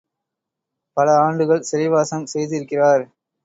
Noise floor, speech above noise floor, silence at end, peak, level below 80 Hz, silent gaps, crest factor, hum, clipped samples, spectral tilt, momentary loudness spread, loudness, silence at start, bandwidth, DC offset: -83 dBFS; 65 dB; 0.4 s; -4 dBFS; -68 dBFS; none; 16 dB; none; under 0.1%; -5.5 dB/octave; 9 LU; -18 LUFS; 0.95 s; 8 kHz; under 0.1%